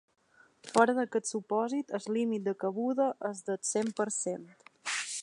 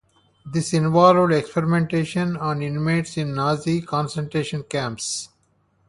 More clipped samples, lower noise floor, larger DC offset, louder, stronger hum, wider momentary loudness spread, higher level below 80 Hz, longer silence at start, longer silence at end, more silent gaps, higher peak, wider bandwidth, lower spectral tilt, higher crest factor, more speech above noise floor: neither; second, -58 dBFS vs -64 dBFS; neither; second, -32 LUFS vs -22 LUFS; neither; second, 9 LU vs 12 LU; second, -84 dBFS vs -56 dBFS; first, 0.65 s vs 0.45 s; second, 0 s vs 0.6 s; neither; second, -10 dBFS vs -2 dBFS; about the same, 11.5 kHz vs 11.5 kHz; second, -3.5 dB/octave vs -6 dB/octave; about the same, 24 dB vs 20 dB; second, 27 dB vs 43 dB